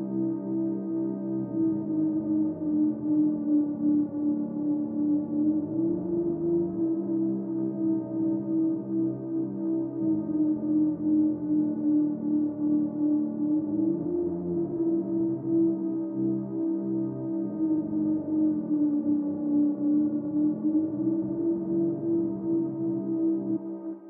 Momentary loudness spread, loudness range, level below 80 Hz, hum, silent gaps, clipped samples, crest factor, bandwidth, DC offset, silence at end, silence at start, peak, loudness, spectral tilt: 4 LU; 2 LU; -66 dBFS; none; none; under 0.1%; 10 dB; 1.7 kHz; under 0.1%; 0 s; 0 s; -16 dBFS; -28 LUFS; -12 dB/octave